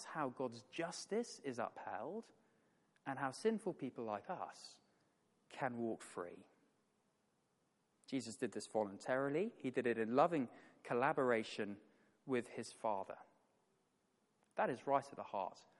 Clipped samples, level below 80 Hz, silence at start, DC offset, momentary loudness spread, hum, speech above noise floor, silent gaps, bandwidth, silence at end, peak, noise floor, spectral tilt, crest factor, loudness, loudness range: under 0.1%; under -90 dBFS; 0 s; under 0.1%; 14 LU; none; 40 dB; none; 11.5 kHz; 0.2 s; -20 dBFS; -81 dBFS; -5 dB/octave; 24 dB; -42 LUFS; 10 LU